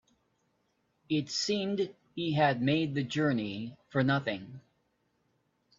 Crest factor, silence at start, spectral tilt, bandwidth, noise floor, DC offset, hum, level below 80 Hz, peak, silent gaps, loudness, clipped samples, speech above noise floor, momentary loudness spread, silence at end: 20 dB; 1.1 s; -5.5 dB/octave; 7.6 kHz; -75 dBFS; under 0.1%; 60 Hz at -55 dBFS; -70 dBFS; -12 dBFS; none; -31 LUFS; under 0.1%; 45 dB; 10 LU; 1.2 s